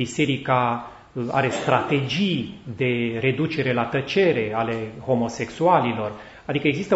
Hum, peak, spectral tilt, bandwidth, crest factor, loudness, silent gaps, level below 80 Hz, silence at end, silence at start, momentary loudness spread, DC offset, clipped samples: none; -2 dBFS; -6 dB/octave; 8 kHz; 20 dB; -23 LUFS; none; -56 dBFS; 0 s; 0 s; 9 LU; under 0.1%; under 0.1%